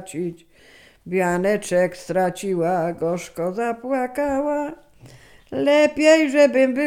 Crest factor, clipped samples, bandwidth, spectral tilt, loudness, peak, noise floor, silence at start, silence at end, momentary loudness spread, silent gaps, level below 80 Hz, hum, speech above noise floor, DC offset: 18 dB; under 0.1%; 16 kHz; -5 dB/octave; -20 LUFS; -2 dBFS; -47 dBFS; 0 s; 0 s; 12 LU; none; -56 dBFS; none; 27 dB; under 0.1%